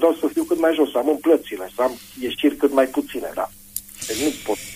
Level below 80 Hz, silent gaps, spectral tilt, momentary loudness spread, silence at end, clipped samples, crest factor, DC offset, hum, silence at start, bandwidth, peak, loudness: -54 dBFS; none; -3.5 dB/octave; 11 LU; 0 s; under 0.1%; 16 dB; under 0.1%; 50 Hz at -55 dBFS; 0 s; 15.5 kHz; -4 dBFS; -22 LUFS